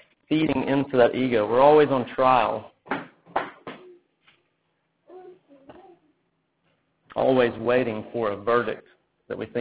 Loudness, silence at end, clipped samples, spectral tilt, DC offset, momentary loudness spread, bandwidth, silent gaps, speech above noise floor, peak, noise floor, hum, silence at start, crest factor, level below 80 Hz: -23 LUFS; 0 s; under 0.1%; -10 dB/octave; under 0.1%; 16 LU; 4 kHz; none; 51 dB; -4 dBFS; -73 dBFS; none; 0.3 s; 20 dB; -60 dBFS